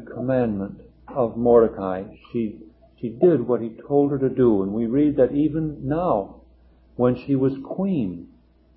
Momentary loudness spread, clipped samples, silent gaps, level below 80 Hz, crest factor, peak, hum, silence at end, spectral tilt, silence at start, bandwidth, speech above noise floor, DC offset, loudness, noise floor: 13 LU; under 0.1%; none; -50 dBFS; 18 dB; -4 dBFS; none; 0.5 s; -13 dB/octave; 0 s; 4.8 kHz; 32 dB; under 0.1%; -22 LUFS; -53 dBFS